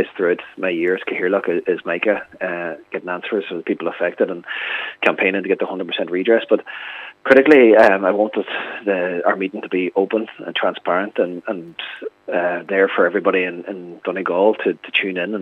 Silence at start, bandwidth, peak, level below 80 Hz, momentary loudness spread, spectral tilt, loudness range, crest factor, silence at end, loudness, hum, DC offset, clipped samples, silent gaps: 0 s; 7.8 kHz; 0 dBFS; -70 dBFS; 13 LU; -6.5 dB/octave; 7 LU; 18 dB; 0 s; -18 LUFS; none; under 0.1%; under 0.1%; none